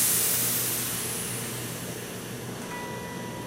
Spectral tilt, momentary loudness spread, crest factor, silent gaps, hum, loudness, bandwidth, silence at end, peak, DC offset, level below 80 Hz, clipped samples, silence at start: -2 dB/octave; 14 LU; 18 dB; none; none; -28 LUFS; 16 kHz; 0 s; -12 dBFS; under 0.1%; -58 dBFS; under 0.1%; 0 s